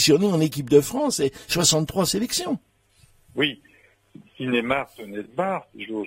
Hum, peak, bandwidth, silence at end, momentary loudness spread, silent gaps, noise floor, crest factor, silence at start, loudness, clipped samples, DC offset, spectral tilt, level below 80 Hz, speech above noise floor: none; -4 dBFS; 16 kHz; 0 s; 14 LU; none; -58 dBFS; 20 dB; 0 s; -23 LUFS; under 0.1%; under 0.1%; -4 dB/octave; -54 dBFS; 36 dB